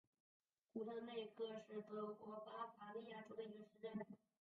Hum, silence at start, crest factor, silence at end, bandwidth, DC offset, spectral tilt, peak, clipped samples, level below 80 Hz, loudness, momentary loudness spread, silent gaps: none; 0.75 s; 16 dB; 0.35 s; 6.8 kHz; under 0.1%; -4.5 dB/octave; -36 dBFS; under 0.1%; under -90 dBFS; -53 LUFS; 5 LU; none